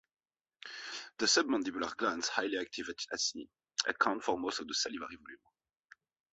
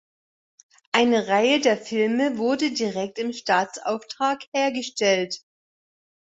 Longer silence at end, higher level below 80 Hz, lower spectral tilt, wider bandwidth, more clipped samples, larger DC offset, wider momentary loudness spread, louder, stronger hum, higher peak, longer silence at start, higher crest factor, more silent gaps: about the same, 0.95 s vs 0.95 s; about the same, -74 dBFS vs -70 dBFS; second, -1 dB/octave vs -3.5 dB/octave; about the same, 8.2 kHz vs 8 kHz; neither; neither; first, 18 LU vs 9 LU; second, -34 LUFS vs -23 LUFS; neither; second, -8 dBFS vs -4 dBFS; second, 0.65 s vs 0.95 s; first, 28 dB vs 20 dB; second, none vs 4.48-4.52 s